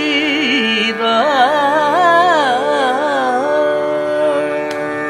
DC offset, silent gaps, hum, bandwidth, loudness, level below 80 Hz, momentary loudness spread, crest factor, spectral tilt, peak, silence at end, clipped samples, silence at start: under 0.1%; none; none; 13.5 kHz; -14 LUFS; -60 dBFS; 6 LU; 14 dB; -3.5 dB/octave; 0 dBFS; 0 s; under 0.1%; 0 s